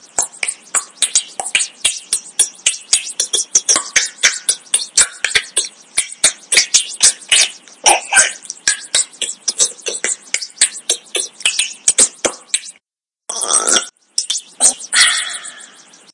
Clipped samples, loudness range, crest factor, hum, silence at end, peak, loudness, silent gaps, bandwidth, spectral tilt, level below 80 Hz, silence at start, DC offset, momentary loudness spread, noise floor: 0.1%; 4 LU; 18 dB; none; 0.5 s; 0 dBFS; -14 LUFS; none; 12 kHz; 2.5 dB/octave; -58 dBFS; 0.15 s; under 0.1%; 9 LU; -82 dBFS